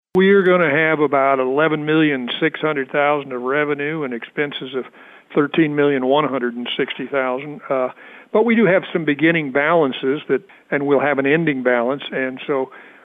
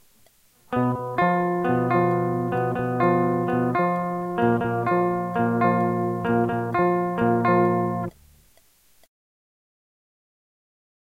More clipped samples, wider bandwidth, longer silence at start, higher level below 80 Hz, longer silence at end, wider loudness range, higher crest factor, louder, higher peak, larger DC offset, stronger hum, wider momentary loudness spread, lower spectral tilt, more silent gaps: neither; second, 4 kHz vs 15.5 kHz; second, 0.15 s vs 0.7 s; second, -66 dBFS vs -58 dBFS; second, 0.2 s vs 2.95 s; about the same, 3 LU vs 4 LU; about the same, 14 dB vs 16 dB; first, -18 LUFS vs -23 LUFS; first, -4 dBFS vs -8 dBFS; neither; neither; first, 9 LU vs 5 LU; about the same, -8.5 dB/octave vs -9 dB/octave; neither